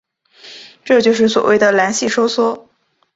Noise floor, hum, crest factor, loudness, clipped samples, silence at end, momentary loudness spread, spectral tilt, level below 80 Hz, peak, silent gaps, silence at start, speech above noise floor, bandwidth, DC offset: -42 dBFS; none; 16 dB; -14 LUFS; under 0.1%; 0.55 s; 21 LU; -3.5 dB/octave; -60 dBFS; 0 dBFS; none; 0.45 s; 29 dB; 8 kHz; under 0.1%